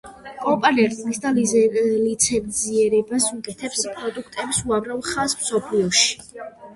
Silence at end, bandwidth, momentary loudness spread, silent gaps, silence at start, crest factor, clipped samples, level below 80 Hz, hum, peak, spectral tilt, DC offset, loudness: 0 s; 12 kHz; 12 LU; none; 0.05 s; 18 dB; under 0.1%; -54 dBFS; none; -2 dBFS; -2.5 dB/octave; under 0.1%; -20 LUFS